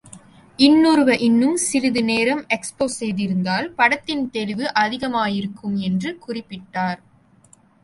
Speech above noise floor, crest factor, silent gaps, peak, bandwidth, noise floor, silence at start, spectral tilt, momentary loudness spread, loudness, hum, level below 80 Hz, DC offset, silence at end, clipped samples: 34 dB; 18 dB; none; -2 dBFS; 11.5 kHz; -53 dBFS; 0.05 s; -4.5 dB/octave; 11 LU; -19 LUFS; none; -58 dBFS; under 0.1%; 0.9 s; under 0.1%